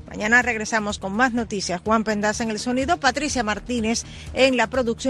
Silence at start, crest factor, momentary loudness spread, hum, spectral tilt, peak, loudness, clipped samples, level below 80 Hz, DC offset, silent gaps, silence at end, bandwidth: 0.05 s; 18 dB; 8 LU; none; -3.5 dB/octave; -4 dBFS; -22 LUFS; under 0.1%; -42 dBFS; under 0.1%; none; 0 s; 12.5 kHz